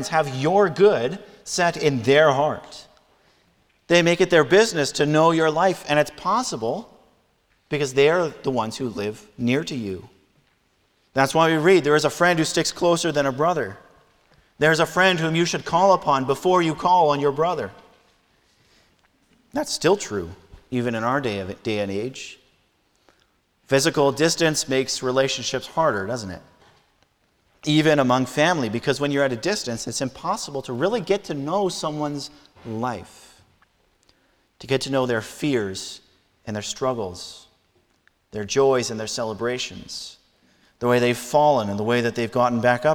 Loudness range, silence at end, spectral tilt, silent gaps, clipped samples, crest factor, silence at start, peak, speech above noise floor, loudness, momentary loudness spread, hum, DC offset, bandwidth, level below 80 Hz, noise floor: 8 LU; 0 s; -4.5 dB/octave; none; under 0.1%; 20 dB; 0 s; -4 dBFS; 44 dB; -21 LUFS; 14 LU; none; under 0.1%; 18.5 kHz; -58 dBFS; -65 dBFS